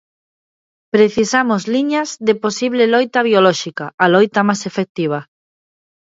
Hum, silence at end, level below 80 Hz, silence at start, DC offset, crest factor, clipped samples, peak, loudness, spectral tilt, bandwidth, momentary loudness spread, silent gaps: none; 0.8 s; -60 dBFS; 0.95 s; under 0.1%; 16 dB; under 0.1%; 0 dBFS; -15 LUFS; -4.5 dB/octave; 7.8 kHz; 9 LU; 3.94-3.98 s, 4.89-4.95 s